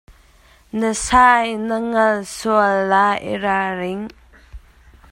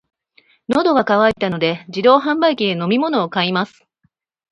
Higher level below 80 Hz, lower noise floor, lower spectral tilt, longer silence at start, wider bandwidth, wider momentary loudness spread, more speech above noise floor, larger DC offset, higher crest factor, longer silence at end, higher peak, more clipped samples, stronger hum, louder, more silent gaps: first, -42 dBFS vs -56 dBFS; second, -51 dBFS vs -65 dBFS; second, -4 dB/octave vs -6.5 dB/octave; second, 0.1 s vs 0.7 s; first, 16 kHz vs 10 kHz; first, 13 LU vs 7 LU; second, 34 dB vs 49 dB; neither; about the same, 18 dB vs 18 dB; second, 0.55 s vs 0.85 s; about the same, 0 dBFS vs 0 dBFS; neither; neither; about the same, -17 LUFS vs -16 LUFS; neither